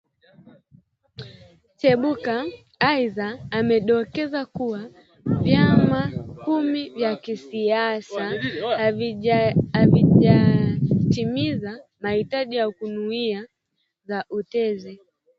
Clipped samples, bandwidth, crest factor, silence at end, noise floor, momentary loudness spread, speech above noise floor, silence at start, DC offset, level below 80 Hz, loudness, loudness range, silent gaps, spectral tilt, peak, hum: under 0.1%; 7.4 kHz; 20 dB; 0.45 s; -75 dBFS; 14 LU; 54 dB; 1.2 s; under 0.1%; -48 dBFS; -22 LUFS; 7 LU; none; -8.5 dB/octave; -2 dBFS; none